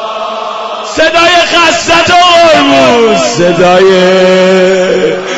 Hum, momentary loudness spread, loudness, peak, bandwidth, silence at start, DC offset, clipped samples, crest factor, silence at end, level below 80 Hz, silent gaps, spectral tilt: none; 12 LU; -5 LUFS; 0 dBFS; 12 kHz; 0 s; under 0.1%; 2%; 6 dB; 0 s; -40 dBFS; none; -3.5 dB/octave